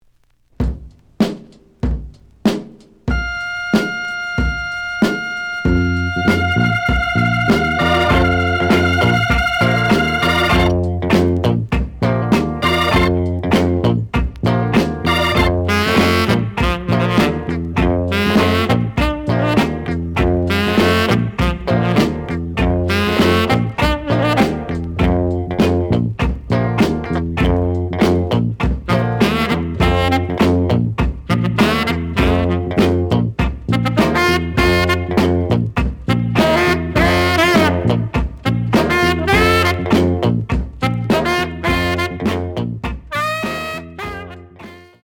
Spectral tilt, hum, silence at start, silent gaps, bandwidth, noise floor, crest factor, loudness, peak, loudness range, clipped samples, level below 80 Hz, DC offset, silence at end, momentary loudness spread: -6.5 dB/octave; none; 0.6 s; none; 18.5 kHz; -55 dBFS; 14 dB; -16 LUFS; -2 dBFS; 5 LU; under 0.1%; -28 dBFS; under 0.1%; 0.25 s; 8 LU